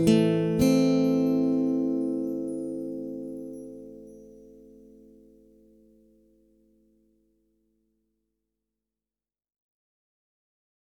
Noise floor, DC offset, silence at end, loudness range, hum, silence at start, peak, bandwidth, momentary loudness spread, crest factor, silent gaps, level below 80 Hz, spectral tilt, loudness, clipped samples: under -90 dBFS; under 0.1%; 6.55 s; 22 LU; none; 0 s; -8 dBFS; 15.5 kHz; 21 LU; 20 dB; none; -58 dBFS; -7 dB/octave; -26 LUFS; under 0.1%